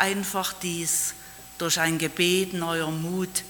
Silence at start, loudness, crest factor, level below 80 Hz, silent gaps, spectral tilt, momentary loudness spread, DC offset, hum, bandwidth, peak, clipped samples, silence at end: 0 s; -25 LUFS; 22 dB; -58 dBFS; none; -3 dB/octave; 7 LU; under 0.1%; none; 19 kHz; -4 dBFS; under 0.1%; 0 s